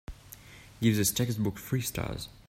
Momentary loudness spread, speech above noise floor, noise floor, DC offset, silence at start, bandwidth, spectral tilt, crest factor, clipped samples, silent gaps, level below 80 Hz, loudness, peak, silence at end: 22 LU; 21 dB; -51 dBFS; under 0.1%; 0.1 s; 16.5 kHz; -4.5 dB/octave; 20 dB; under 0.1%; none; -50 dBFS; -30 LUFS; -12 dBFS; 0.2 s